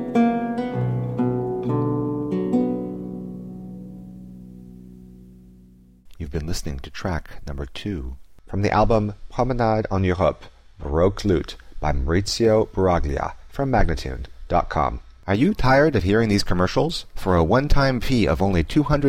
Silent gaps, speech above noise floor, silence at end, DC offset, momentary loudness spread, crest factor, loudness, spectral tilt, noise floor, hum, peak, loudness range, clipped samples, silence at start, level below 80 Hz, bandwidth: none; 30 dB; 0 s; under 0.1%; 18 LU; 16 dB; -22 LUFS; -6.5 dB/octave; -50 dBFS; none; -6 dBFS; 13 LU; under 0.1%; 0 s; -32 dBFS; 15.5 kHz